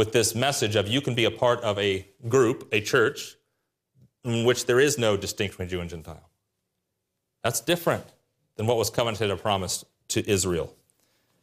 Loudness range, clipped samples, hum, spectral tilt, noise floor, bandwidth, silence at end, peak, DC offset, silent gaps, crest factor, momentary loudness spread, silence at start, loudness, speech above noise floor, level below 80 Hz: 5 LU; under 0.1%; none; -4 dB/octave; -80 dBFS; 15.5 kHz; 0.75 s; -8 dBFS; under 0.1%; none; 18 dB; 11 LU; 0 s; -25 LUFS; 56 dB; -60 dBFS